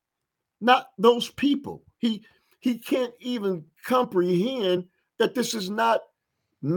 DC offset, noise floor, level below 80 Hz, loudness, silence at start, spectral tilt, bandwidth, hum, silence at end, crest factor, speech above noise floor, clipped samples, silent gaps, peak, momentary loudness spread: under 0.1%; -84 dBFS; -70 dBFS; -25 LUFS; 0.6 s; -5 dB/octave; 19.5 kHz; none; 0 s; 22 dB; 60 dB; under 0.1%; none; -4 dBFS; 9 LU